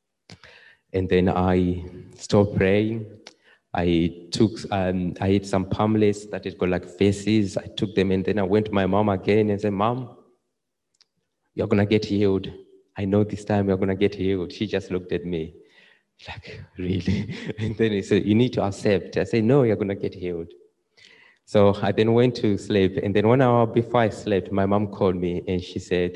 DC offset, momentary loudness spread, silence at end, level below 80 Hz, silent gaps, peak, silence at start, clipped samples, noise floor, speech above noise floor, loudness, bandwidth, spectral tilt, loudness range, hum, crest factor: under 0.1%; 12 LU; 0 s; -44 dBFS; none; -4 dBFS; 0.3 s; under 0.1%; -80 dBFS; 58 dB; -23 LUFS; 10.5 kHz; -7 dB/octave; 5 LU; none; 18 dB